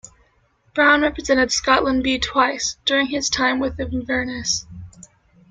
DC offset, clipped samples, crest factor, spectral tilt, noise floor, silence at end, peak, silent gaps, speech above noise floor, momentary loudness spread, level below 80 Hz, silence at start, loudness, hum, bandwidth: under 0.1%; under 0.1%; 18 dB; -2.5 dB/octave; -61 dBFS; 0.6 s; -2 dBFS; none; 41 dB; 9 LU; -42 dBFS; 0.75 s; -19 LUFS; none; 9.4 kHz